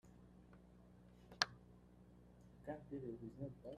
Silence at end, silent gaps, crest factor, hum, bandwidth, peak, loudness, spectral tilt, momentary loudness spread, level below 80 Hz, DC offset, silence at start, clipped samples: 0 s; none; 38 dB; 60 Hz at -70 dBFS; 13 kHz; -14 dBFS; -47 LUFS; -3.5 dB/octave; 24 LU; -70 dBFS; under 0.1%; 0.05 s; under 0.1%